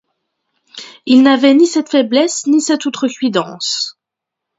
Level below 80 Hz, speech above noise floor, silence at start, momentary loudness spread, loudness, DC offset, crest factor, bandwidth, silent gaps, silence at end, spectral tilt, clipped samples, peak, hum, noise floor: -66 dBFS; 69 dB; 0.75 s; 13 LU; -13 LUFS; under 0.1%; 14 dB; 8 kHz; none; 0.65 s; -3 dB/octave; under 0.1%; 0 dBFS; none; -81 dBFS